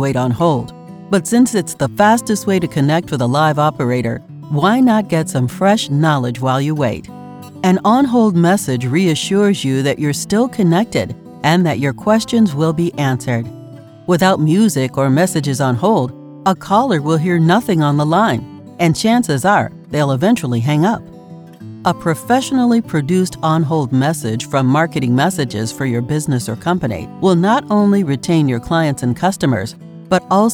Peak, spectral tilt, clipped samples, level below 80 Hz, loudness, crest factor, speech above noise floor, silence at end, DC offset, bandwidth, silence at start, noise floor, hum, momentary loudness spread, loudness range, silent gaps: -2 dBFS; -6 dB/octave; under 0.1%; -48 dBFS; -15 LUFS; 14 dB; 21 dB; 0 s; under 0.1%; 18.5 kHz; 0 s; -36 dBFS; none; 8 LU; 2 LU; none